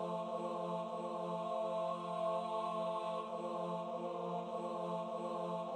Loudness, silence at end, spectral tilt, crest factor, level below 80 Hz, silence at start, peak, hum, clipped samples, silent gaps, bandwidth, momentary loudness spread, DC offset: -41 LUFS; 0 s; -6.5 dB/octave; 12 dB; under -90 dBFS; 0 s; -28 dBFS; none; under 0.1%; none; 10 kHz; 3 LU; under 0.1%